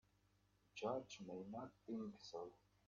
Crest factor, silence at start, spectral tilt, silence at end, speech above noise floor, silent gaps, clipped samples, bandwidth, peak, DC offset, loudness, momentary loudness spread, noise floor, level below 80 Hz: 20 dB; 0.75 s; -5 dB/octave; 0.3 s; 29 dB; none; under 0.1%; 7.2 kHz; -32 dBFS; under 0.1%; -51 LUFS; 8 LU; -79 dBFS; -84 dBFS